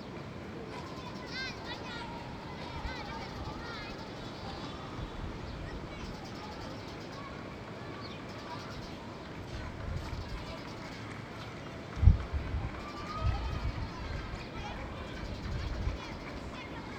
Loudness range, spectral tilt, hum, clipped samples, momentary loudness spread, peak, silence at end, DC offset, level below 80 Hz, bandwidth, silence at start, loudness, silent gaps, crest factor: 8 LU; -6 dB/octave; none; under 0.1%; 7 LU; -8 dBFS; 0 s; under 0.1%; -40 dBFS; 9.2 kHz; 0 s; -39 LUFS; none; 30 dB